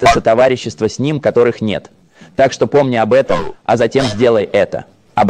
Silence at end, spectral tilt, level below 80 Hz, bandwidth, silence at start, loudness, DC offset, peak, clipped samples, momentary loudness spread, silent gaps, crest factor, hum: 0 s; -5.5 dB/octave; -40 dBFS; 11 kHz; 0 s; -14 LUFS; under 0.1%; 0 dBFS; under 0.1%; 8 LU; none; 14 dB; none